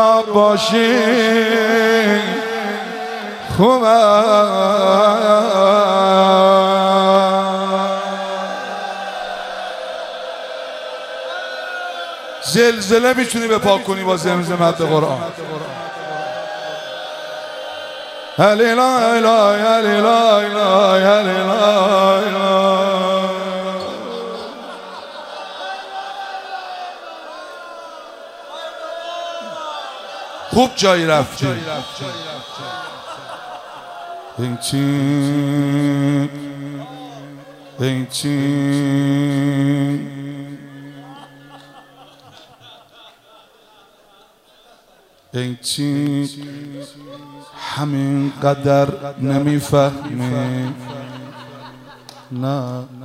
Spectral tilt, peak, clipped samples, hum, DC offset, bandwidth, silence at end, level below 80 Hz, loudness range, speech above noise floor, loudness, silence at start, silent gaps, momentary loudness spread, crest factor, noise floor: -5 dB/octave; 0 dBFS; under 0.1%; none; under 0.1%; 15.5 kHz; 0 s; -58 dBFS; 15 LU; 37 dB; -16 LUFS; 0 s; none; 19 LU; 18 dB; -51 dBFS